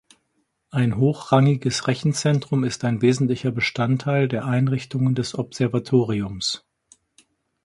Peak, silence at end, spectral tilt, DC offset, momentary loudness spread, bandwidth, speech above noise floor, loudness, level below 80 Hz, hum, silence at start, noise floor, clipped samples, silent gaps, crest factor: -4 dBFS; 1.05 s; -6 dB/octave; under 0.1%; 6 LU; 11.5 kHz; 50 dB; -22 LUFS; -54 dBFS; none; 0.75 s; -71 dBFS; under 0.1%; none; 18 dB